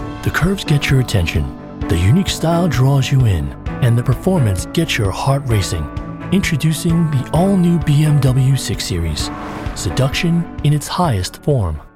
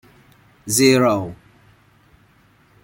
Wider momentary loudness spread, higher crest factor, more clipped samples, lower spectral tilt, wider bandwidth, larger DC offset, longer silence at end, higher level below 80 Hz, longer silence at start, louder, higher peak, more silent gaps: second, 8 LU vs 20 LU; second, 12 dB vs 20 dB; neither; first, -6 dB/octave vs -4 dB/octave; about the same, 15.5 kHz vs 16.5 kHz; neither; second, 0.1 s vs 1.5 s; first, -30 dBFS vs -56 dBFS; second, 0 s vs 0.65 s; about the same, -16 LUFS vs -16 LUFS; about the same, -4 dBFS vs -2 dBFS; neither